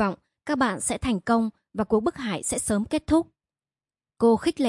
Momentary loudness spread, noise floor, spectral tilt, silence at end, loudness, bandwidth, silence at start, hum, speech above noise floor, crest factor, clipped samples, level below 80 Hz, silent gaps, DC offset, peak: 8 LU; under -90 dBFS; -4.5 dB/octave; 0 s; -25 LUFS; 11.5 kHz; 0 s; none; over 66 dB; 16 dB; under 0.1%; -50 dBFS; none; under 0.1%; -10 dBFS